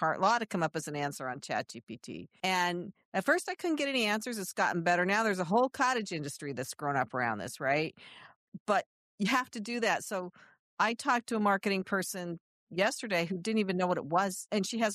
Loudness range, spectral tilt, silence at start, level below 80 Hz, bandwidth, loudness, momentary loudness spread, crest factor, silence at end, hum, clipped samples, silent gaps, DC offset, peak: 3 LU; -4 dB/octave; 0 s; -78 dBFS; 14 kHz; -32 LUFS; 11 LU; 18 dB; 0 s; none; under 0.1%; 1.83-1.87 s, 3.05-3.12 s, 8.36-8.52 s, 8.60-8.66 s, 8.86-9.18 s, 10.59-10.77 s, 12.40-12.67 s; under 0.1%; -14 dBFS